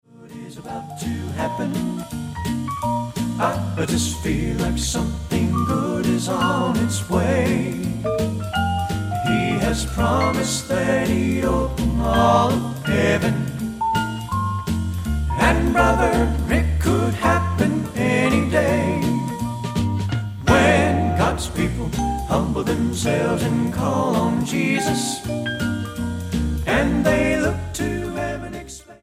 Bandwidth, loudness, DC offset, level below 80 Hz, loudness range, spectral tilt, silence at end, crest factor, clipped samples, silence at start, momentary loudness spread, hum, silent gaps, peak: 16 kHz; -21 LUFS; under 0.1%; -32 dBFS; 3 LU; -5.5 dB/octave; 0.05 s; 18 dB; under 0.1%; 0.15 s; 8 LU; none; none; -2 dBFS